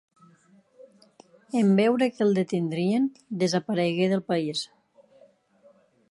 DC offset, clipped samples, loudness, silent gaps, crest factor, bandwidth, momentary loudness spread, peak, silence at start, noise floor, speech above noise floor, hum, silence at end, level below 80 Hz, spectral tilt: under 0.1%; under 0.1%; -25 LUFS; none; 18 dB; 11.5 kHz; 9 LU; -10 dBFS; 1.55 s; -59 dBFS; 35 dB; none; 1.45 s; -74 dBFS; -6 dB/octave